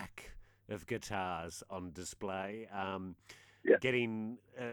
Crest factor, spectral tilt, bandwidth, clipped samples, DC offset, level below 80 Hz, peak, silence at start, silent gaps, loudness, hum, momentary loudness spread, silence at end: 24 dB; -5 dB/octave; 20 kHz; under 0.1%; under 0.1%; -64 dBFS; -14 dBFS; 0 s; none; -38 LUFS; none; 19 LU; 0 s